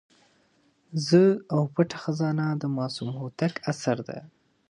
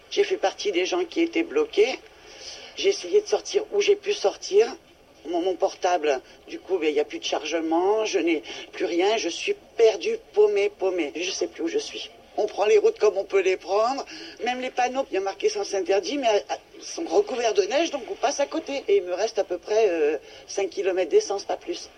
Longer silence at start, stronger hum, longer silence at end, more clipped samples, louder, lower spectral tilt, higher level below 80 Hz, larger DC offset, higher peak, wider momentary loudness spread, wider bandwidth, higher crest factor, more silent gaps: first, 0.9 s vs 0.1 s; neither; first, 0.45 s vs 0.1 s; neither; about the same, -26 LUFS vs -24 LUFS; first, -6.5 dB/octave vs -2 dB/octave; second, -70 dBFS vs -64 dBFS; neither; about the same, -8 dBFS vs -8 dBFS; first, 14 LU vs 10 LU; first, 11 kHz vs 9.2 kHz; about the same, 20 dB vs 16 dB; neither